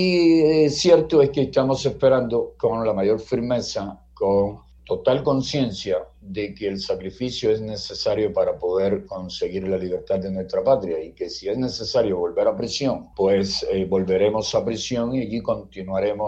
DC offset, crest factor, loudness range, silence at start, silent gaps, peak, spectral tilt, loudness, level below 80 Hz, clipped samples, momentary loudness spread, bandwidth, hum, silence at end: under 0.1%; 20 dB; 5 LU; 0 s; none; -2 dBFS; -5.5 dB/octave; -22 LUFS; -48 dBFS; under 0.1%; 11 LU; 8.4 kHz; none; 0 s